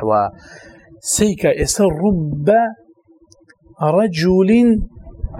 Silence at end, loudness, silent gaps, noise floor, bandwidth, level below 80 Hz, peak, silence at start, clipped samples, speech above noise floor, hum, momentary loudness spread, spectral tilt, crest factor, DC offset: 0 s; -16 LUFS; none; -51 dBFS; 16 kHz; -34 dBFS; 0 dBFS; 0 s; under 0.1%; 36 dB; none; 11 LU; -5.5 dB/octave; 16 dB; under 0.1%